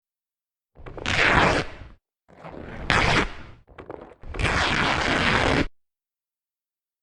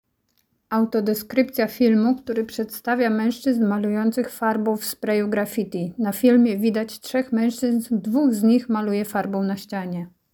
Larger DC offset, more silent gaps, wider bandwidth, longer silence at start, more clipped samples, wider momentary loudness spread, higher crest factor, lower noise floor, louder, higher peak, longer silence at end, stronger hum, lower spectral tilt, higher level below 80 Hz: neither; neither; second, 11.5 kHz vs 19.5 kHz; about the same, 0.8 s vs 0.7 s; neither; first, 23 LU vs 9 LU; first, 24 dB vs 16 dB; first, under -90 dBFS vs -69 dBFS; about the same, -22 LUFS vs -22 LUFS; first, -2 dBFS vs -6 dBFS; first, 1.35 s vs 0.25 s; neither; second, -4 dB/octave vs -6 dB/octave; first, -38 dBFS vs -64 dBFS